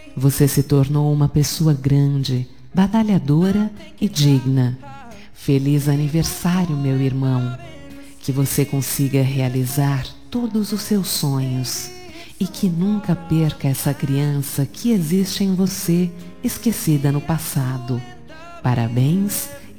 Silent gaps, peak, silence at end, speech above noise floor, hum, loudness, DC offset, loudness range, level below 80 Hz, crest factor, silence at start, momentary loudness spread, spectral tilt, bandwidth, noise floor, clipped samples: none; -2 dBFS; 0.05 s; 21 dB; none; -19 LUFS; 1%; 4 LU; -44 dBFS; 16 dB; 0.05 s; 10 LU; -6 dB/octave; 19 kHz; -40 dBFS; under 0.1%